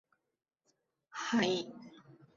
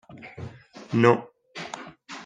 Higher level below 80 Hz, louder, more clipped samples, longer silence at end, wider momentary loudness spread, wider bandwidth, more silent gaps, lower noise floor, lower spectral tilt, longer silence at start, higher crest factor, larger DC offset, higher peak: second, -78 dBFS vs -66 dBFS; second, -34 LUFS vs -23 LUFS; neither; first, 0.25 s vs 0 s; about the same, 22 LU vs 22 LU; second, 7.6 kHz vs 9.4 kHz; neither; first, -80 dBFS vs -42 dBFS; second, -3 dB/octave vs -6.5 dB/octave; first, 1.15 s vs 0.1 s; about the same, 22 dB vs 24 dB; neither; second, -16 dBFS vs -2 dBFS